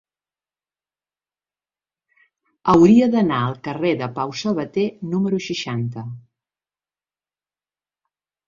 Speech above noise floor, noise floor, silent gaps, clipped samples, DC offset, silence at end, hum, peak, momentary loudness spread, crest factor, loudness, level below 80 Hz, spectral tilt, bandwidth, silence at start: over 71 dB; under -90 dBFS; none; under 0.1%; under 0.1%; 2.3 s; 50 Hz at -45 dBFS; -2 dBFS; 13 LU; 20 dB; -19 LUFS; -56 dBFS; -7 dB/octave; 7.6 kHz; 2.65 s